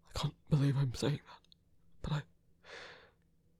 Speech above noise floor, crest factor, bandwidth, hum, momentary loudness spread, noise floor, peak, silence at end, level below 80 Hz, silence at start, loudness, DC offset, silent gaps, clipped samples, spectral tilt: 36 dB; 20 dB; 12 kHz; none; 21 LU; -70 dBFS; -18 dBFS; 0.65 s; -56 dBFS; 0.15 s; -36 LUFS; under 0.1%; none; under 0.1%; -6.5 dB/octave